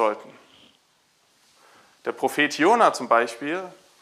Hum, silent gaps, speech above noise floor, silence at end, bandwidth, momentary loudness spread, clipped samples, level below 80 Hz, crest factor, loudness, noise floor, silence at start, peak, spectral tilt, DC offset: none; none; 42 dB; 0.3 s; 15.5 kHz; 16 LU; under 0.1%; -82 dBFS; 22 dB; -22 LUFS; -64 dBFS; 0 s; -4 dBFS; -3.5 dB/octave; under 0.1%